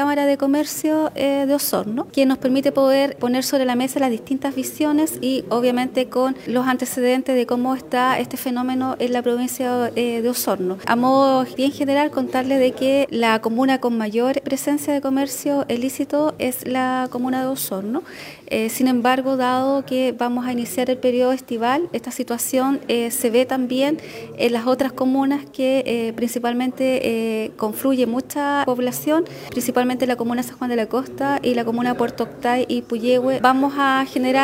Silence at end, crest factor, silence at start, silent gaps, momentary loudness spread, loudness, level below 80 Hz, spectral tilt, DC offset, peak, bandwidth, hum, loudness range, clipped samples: 0 s; 18 dB; 0 s; none; 5 LU; -20 LUFS; -62 dBFS; -4 dB/octave; under 0.1%; -2 dBFS; 16.5 kHz; none; 2 LU; under 0.1%